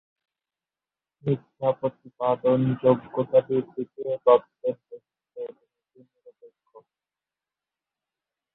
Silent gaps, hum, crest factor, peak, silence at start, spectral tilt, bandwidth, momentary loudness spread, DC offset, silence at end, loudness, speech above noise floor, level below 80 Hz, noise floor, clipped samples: none; none; 22 dB; -4 dBFS; 1.25 s; -11.5 dB/octave; 4 kHz; 18 LU; under 0.1%; 3.05 s; -25 LUFS; over 66 dB; -68 dBFS; under -90 dBFS; under 0.1%